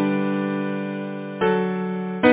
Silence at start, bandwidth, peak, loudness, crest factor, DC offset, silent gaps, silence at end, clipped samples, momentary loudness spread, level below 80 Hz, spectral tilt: 0 s; 4 kHz; -2 dBFS; -24 LUFS; 20 dB; under 0.1%; none; 0 s; under 0.1%; 8 LU; -58 dBFS; -11 dB/octave